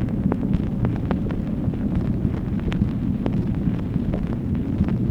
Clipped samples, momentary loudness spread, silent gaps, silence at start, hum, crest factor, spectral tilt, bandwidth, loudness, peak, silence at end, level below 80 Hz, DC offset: under 0.1%; 2 LU; none; 0 s; none; 18 dB; -10 dB/octave; 6.4 kHz; -24 LUFS; -4 dBFS; 0 s; -32 dBFS; under 0.1%